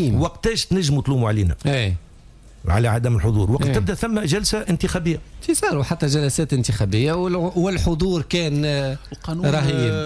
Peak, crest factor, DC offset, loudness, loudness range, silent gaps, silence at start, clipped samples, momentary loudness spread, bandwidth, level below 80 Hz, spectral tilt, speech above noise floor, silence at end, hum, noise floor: -8 dBFS; 12 dB; under 0.1%; -21 LUFS; 1 LU; none; 0 s; under 0.1%; 4 LU; 11 kHz; -34 dBFS; -5.5 dB/octave; 25 dB; 0 s; none; -45 dBFS